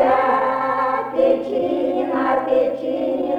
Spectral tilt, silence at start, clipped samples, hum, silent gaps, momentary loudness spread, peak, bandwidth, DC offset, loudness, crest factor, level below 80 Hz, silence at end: -6.5 dB/octave; 0 s; under 0.1%; none; none; 4 LU; -4 dBFS; 5.4 kHz; under 0.1%; -19 LUFS; 14 dB; -56 dBFS; 0 s